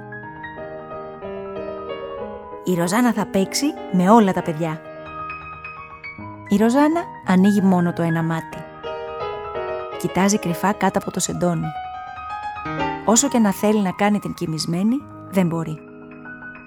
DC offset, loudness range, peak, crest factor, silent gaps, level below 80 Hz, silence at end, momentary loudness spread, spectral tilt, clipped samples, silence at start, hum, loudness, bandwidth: under 0.1%; 3 LU; -2 dBFS; 20 dB; none; -52 dBFS; 0 s; 18 LU; -5 dB/octave; under 0.1%; 0 s; none; -21 LUFS; 17.5 kHz